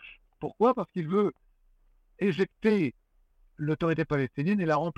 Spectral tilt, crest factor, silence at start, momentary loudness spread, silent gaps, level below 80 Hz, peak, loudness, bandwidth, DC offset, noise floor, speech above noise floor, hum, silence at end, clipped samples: -8.5 dB/octave; 16 dB; 0.05 s; 7 LU; none; -60 dBFS; -12 dBFS; -28 LUFS; 8.4 kHz; under 0.1%; -64 dBFS; 37 dB; none; 0.05 s; under 0.1%